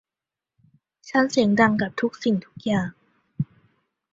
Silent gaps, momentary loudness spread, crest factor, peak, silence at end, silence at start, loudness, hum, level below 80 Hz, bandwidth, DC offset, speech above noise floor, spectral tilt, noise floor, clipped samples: none; 14 LU; 22 dB; -2 dBFS; 0.7 s; 1.05 s; -23 LUFS; none; -60 dBFS; 7.8 kHz; under 0.1%; 67 dB; -6 dB/octave; -89 dBFS; under 0.1%